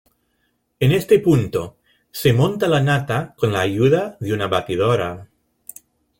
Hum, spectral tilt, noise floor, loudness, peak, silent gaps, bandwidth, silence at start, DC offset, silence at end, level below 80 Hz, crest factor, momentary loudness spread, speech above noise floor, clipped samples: none; -6.5 dB/octave; -68 dBFS; -19 LUFS; -2 dBFS; none; 17 kHz; 0.8 s; under 0.1%; 0.95 s; -50 dBFS; 16 dB; 19 LU; 50 dB; under 0.1%